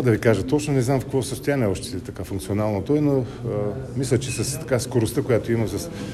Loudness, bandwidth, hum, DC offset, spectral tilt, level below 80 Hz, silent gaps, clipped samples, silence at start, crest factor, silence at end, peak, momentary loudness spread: -23 LUFS; 14 kHz; none; under 0.1%; -6 dB/octave; -44 dBFS; none; under 0.1%; 0 s; 18 dB; 0 s; -4 dBFS; 8 LU